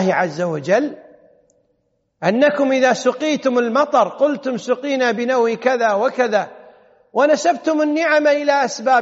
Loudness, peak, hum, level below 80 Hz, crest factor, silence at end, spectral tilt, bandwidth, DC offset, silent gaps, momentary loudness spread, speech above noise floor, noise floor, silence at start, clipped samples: -17 LUFS; -2 dBFS; none; -72 dBFS; 14 dB; 0 s; -3.5 dB/octave; 8 kHz; under 0.1%; none; 6 LU; 50 dB; -67 dBFS; 0 s; under 0.1%